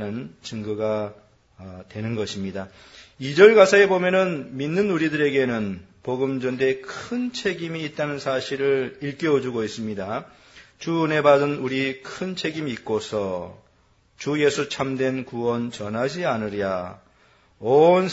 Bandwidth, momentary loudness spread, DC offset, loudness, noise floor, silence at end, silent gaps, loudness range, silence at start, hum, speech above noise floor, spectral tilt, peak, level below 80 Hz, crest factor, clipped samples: 8 kHz; 16 LU; under 0.1%; -22 LUFS; -60 dBFS; 0 s; none; 8 LU; 0 s; none; 38 dB; -5.5 dB/octave; 0 dBFS; -62 dBFS; 22 dB; under 0.1%